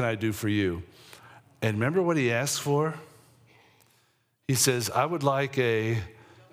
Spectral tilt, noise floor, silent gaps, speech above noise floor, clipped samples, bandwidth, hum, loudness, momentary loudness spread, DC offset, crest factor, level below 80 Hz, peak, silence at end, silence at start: -4.5 dB/octave; -69 dBFS; none; 43 dB; under 0.1%; 16.5 kHz; none; -27 LUFS; 12 LU; under 0.1%; 18 dB; -64 dBFS; -10 dBFS; 0.4 s; 0 s